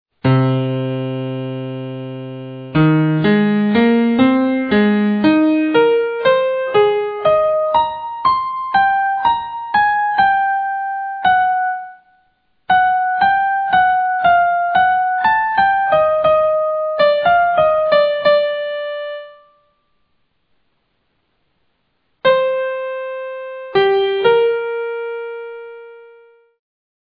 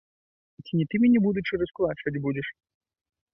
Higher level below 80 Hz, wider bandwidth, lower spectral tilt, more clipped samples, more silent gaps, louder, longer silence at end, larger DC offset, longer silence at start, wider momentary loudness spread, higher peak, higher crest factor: first, -52 dBFS vs -58 dBFS; second, 5.2 kHz vs 5.8 kHz; about the same, -9.5 dB/octave vs -10.5 dB/octave; neither; neither; first, -15 LUFS vs -26 LUFS; first, 1.05 s vs 0.85 s; neither; second, 0.25 s vs 0.65 s; about the same, 12 LU vs 10 LU; first, -2 dBFS vs -12 dBFS; about the same, 14 dB vs 14 dB